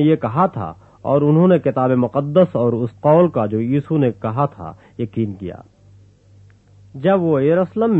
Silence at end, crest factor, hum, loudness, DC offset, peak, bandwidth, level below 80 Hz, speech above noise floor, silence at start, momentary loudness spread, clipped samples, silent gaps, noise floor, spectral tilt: 0 s; 16 dB; 50 Hz at -45 dBFS; -17 LUFS; under 0.1%; -2 dBFS; 4.1 kHz; -54 dBFS; 32 dB; 0 s; 15 LU; under 0.1%; none; -48 dBFS; -10.5 dB/octave